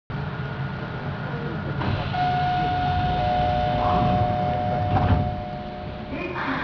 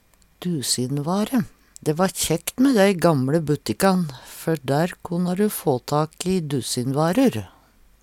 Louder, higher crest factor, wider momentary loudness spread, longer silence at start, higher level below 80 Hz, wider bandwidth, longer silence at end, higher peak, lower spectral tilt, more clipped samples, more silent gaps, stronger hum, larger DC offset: second, -25 LUFS vs -22 LUFS; about the same, 16 dB vs 18 dB; about the same, 10 LU vs 9 LU; second, 0.1 s vs 0.4 s; first, -36 dBFS vs -54 dBFS; second, 5.4 kHz vs 17.5 kHz; second, 0 s vs 0.55 s; second, -8 dBFS vs -4 dBFS; first, -8.5 dB/octave vs -5 dB/octave; neither; neither; neither; neither